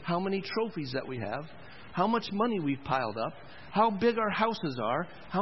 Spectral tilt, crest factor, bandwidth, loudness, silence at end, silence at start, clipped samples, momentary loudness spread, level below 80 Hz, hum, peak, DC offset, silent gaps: -4.5 dB/octave; 18 dB; 5.8 kHz; -31 LUFS; 0 s; 0 s; under 0.1%; 10 LU; -64 dBFS; none; -12 dBFS; 0.4%; none